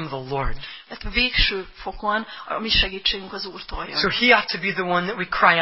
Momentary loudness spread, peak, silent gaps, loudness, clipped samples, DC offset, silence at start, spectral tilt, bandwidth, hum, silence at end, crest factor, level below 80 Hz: 15 LU; 0 dBFS; none; -21 LUFS; under 0.1%; 0.2%; 0 s; -7 dB/octave; 5.8 kHz; none; 0 s; 22 dB; -36 dBFS